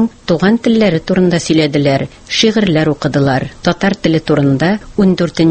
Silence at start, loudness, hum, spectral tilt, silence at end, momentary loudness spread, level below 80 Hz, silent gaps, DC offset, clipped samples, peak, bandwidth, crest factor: 0 s; -13 LUFS; none; -6 dB/octave; 0 s; 4 LU; -40 dBFS; none; under 0.1%; under 0.1%; 0 dBFS; 8.8 kHz; 12 dB